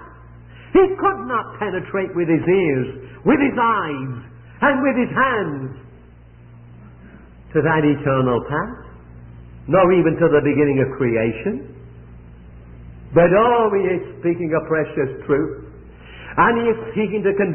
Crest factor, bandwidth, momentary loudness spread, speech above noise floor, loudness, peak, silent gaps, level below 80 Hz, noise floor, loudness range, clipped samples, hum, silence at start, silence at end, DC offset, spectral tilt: 18 dB; 3.3 kHz; 12 LU; 26 dB; -18 LUFS; -2 dBFS; none; -44 dBFS; -44 dBFS; 4 LU; under 0.1%; none; 0 s; 0 s; under 0.1%; -12 dB/octave